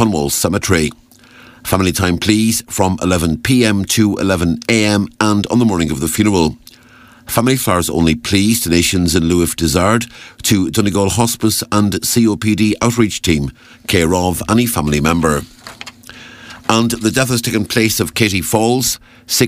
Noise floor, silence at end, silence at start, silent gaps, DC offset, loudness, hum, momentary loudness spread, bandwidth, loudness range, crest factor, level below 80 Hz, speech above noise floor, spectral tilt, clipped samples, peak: -43 dBFS; 0 s; 0 s; none; under 0.1%; -14 LUFS; none; 6 LU; 16 kHz; 2 LU; 14 dB; -36 dBFS; 29 dB; -4.5 dB/octave; under 0.1%; 0 dBFS